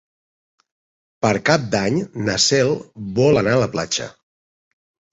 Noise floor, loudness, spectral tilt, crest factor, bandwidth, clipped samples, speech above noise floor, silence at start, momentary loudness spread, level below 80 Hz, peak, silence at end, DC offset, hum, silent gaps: under -90 dBFS; -19 LUFS; -4 dB/octave; 18 dB; 8.2 kHz; under 0.1%; over 72 dB; 1.2 s; 9 LU; -50 dBFS; -2 dBFS; 1 s; under 0.1%; none; none